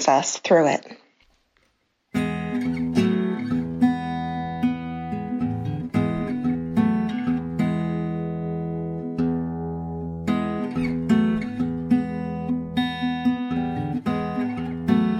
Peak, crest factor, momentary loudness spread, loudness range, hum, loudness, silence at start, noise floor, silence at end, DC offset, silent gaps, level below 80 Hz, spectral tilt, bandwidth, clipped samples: -4 dBFS; 20 dB; 8 LU; 2 LU; none; -25 LUFS; 0 s; -68 dBFS; 0 s; under 0.1%; none; -48 dBFS; -6 dB/octave; 9.8 kHz; under 0.1%